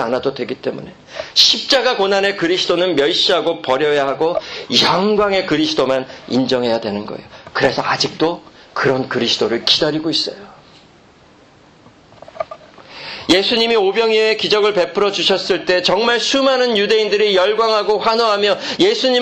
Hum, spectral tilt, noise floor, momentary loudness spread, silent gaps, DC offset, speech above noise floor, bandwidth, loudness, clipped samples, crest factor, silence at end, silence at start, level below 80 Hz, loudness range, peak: none; -3.5 dB/octave; -47 dBFS; 11 LU; none; under 0.1%; 31 dB; 12.5 kHz; -15 LUFS; under 0.1%; 16 dB; 0 s; 0 s; -52 dBFS; 5 LU; 0 dBFS